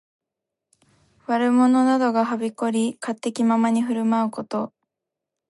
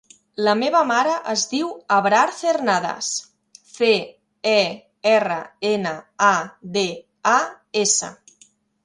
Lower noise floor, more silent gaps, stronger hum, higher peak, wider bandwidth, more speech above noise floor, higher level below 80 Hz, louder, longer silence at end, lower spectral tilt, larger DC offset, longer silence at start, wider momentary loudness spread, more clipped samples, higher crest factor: first, -85 dBFS vs -56 dBFS; neither; neither; second, -10 dBFS vs -2 dBFS; about the same, 11.5 kHz vs 11.5 kHz; first, 64 dB vs 36 dB; second, -76 dBFS vs -70 dBFS; about the same, -21 LUFS vs -20 LUFS; about the same, 0.8 s vs 0.7 s; first, -5.5 dB/octave vs -2.5 dB/octave; neither; first, 1.3 s vs 0.4 s; first, 11 LU vs 8 LU; neither; about the same, 14 dB vs 18 dB